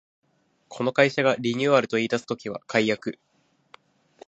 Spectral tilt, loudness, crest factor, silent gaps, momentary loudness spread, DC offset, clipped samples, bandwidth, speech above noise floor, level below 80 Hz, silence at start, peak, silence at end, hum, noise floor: -5 dB/octave; -24 LUFS; 22 dB; none; 12 LU; under 0.1%; under 0.1%; 8.2 kHz; 32 dB; -70 dBFS; 0.7 s; -4 dBFS; 1.15 s; none; -56 dBFS